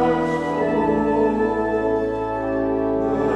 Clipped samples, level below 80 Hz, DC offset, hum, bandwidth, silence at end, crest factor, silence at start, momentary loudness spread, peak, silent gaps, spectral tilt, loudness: under 0.1%; -42 dBFS; under 0.1%; none; 9.6 kHz; 0 s; 12 dB; 0 s; 4 LU; -8 dBFS; none; -8 dB/octave; -21 LUFS